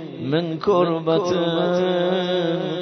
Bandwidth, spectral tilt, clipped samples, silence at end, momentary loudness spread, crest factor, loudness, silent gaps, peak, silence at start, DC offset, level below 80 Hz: 6.4 kHz; -6.5 dB/octave; under 0.1%; 0 s; 4 LU; 14 dB; -21 LUFS; none; -6 dBFS; 0 s; under 0.1%; -62 dBFS